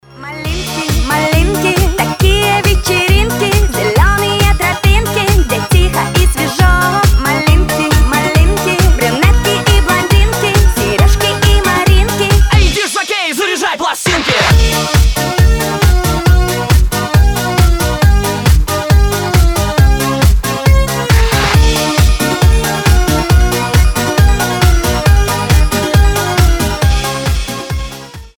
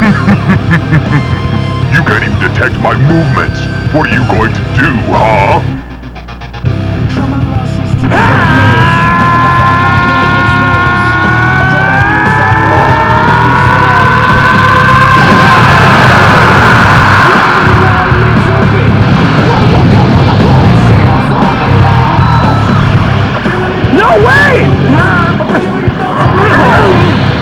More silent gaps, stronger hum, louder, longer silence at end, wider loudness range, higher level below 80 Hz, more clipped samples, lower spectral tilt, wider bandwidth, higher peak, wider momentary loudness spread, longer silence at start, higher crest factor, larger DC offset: neither; neither; second, -11 LUFS vs -6 LUFS; about the same, 0.1 s vs 0 s; second, 1 LU vs 6 LU; first, -14 dBFS vs -22 dBFS; second, under 0.1% vs 7%; second, -4.5 dB/octave vs -7 dB/octave; first, over 20 kHz vs 12 kHz; about the same, 0 dBFS vs 0 dBFS; second, 3 LU vs 8 LU; first, 0.15 s vs 0 s; about the same, 10 dB vs 6 dB; second, under 0.1% vs 0.3%